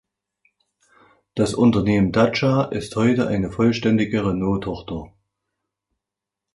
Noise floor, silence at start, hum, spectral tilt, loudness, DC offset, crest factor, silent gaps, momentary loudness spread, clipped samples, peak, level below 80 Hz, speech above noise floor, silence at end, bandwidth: -86 dBFS; 1.35 s; none; -7 dB/octave; -20 LUFS; under 0.1%; 18 dB; none; 12 LU; under 0.1%; -4 dBFS; -46 dBFS; 67 dB; 1.5 s; 11.5 kHz